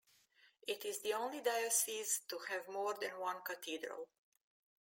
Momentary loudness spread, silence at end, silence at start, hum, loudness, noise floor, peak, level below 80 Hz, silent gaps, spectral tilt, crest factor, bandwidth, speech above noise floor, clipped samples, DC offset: 12 LU; 0.75 s; 0.45 s; none; -40 LUFS; -71 dBFS; -22 dBFS; under -90 dBFS; none; 0.5 dB/octave; 20 dB; 17 kHz; 30 dB; under 0.1%; under 0.1%